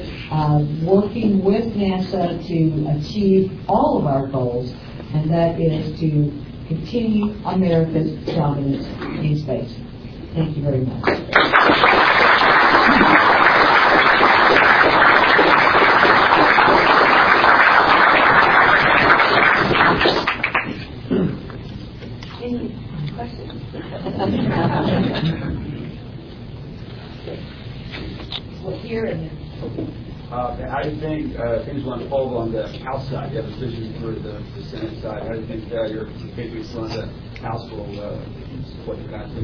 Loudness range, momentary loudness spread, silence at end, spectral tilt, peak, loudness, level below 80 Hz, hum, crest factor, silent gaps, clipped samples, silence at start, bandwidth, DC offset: 17 LU; 20 LU; 0 s; -7 dB/octave; 0 dBFS; -16 LUFS; -40 dBFS; none; 18 dB; none; under 0.1%; 0 s; 5.4 kHz; under 0.1%